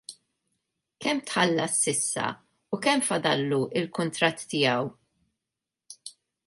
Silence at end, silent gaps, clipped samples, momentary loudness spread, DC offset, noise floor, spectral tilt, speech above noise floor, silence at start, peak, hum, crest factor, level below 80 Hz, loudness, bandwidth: 0.35 s; none; under 0.1%; 19 LU; under 0.1%; -88 dBFS; -3 dB/octave; 61 dB; 0.1 s; -6 dBFS; none; 22 dB; -72 dBFS; -26 LUFS; 12 kHz